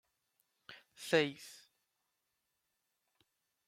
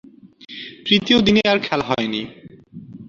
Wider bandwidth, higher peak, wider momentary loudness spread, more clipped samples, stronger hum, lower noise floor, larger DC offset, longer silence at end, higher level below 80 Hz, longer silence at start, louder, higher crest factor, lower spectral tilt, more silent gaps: first, 16 kHz vs 7.4 kHz; second, -16 dBFS vs -2 dBFS; first, 24 LU vs 20 LU; neither; neither; first, -85 dBFS vs -40 dBFS; neither; first, 2.1 s vs 0 s; second, -88 dBFS vs -50 dBFS; first, 0.7 s vs 0.25 s; second, -34 LUFS vs -18 LUFS; first, 26 dB vs 18 dB; about the same, -4 dB/octave vs -5 dB/octave; neither